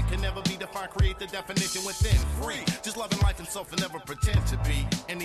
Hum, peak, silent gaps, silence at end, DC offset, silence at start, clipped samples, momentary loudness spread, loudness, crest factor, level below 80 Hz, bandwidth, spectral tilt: none; -12 dBFS; none; 0 s; under 0.1%; 0 s; under 0.1%; 7 LU; -29 LUFS; 16 dB; -32 dBFS; 13 kHz; -4.5 dB/octave